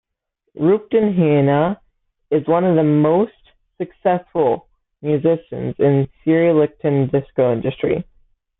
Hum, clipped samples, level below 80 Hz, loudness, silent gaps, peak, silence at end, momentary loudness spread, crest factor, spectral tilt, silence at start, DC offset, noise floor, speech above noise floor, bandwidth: none; under 0.1%; -54 dBFS; -18 LUFS; none; -4 dBFS; 0.6 s; 10 LU; 14 dB; -13 dB/octave; 0.55 s; under 0.1%; -73 dBFS; 57 dB; 4 kHz